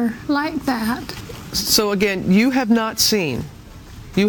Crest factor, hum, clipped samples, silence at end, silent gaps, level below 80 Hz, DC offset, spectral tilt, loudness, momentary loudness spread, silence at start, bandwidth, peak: 18 dB; none; under 0.1%; 0 s; none; -44 dBFS; under 0.1%; -4 dB/octave; -18 LUFS; 14 LU; 0 s; 18 kHz; -2 dBFS